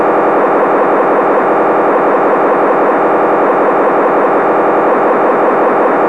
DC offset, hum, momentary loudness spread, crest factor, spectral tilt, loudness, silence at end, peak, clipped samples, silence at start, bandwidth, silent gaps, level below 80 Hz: 0.7%; none; 0 LU; 8 dB; -7.5 dB/octave; -10 LUFS; 0 s; 0 dBFS; under 0.1%; 0 s; 11 kHz; none; -68 dBFS